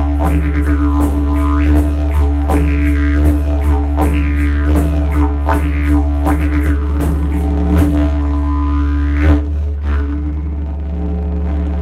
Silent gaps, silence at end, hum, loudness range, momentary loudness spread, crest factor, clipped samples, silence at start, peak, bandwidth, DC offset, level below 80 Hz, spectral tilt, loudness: none; 0 s; none; 2 LU; 6 LU; 12 dB; under 0.1%; 0 s; 0 dBFS; 12.5 kHz; under 0.1%; -14 dBFS; -8.5 dB/octave; -15 LUFS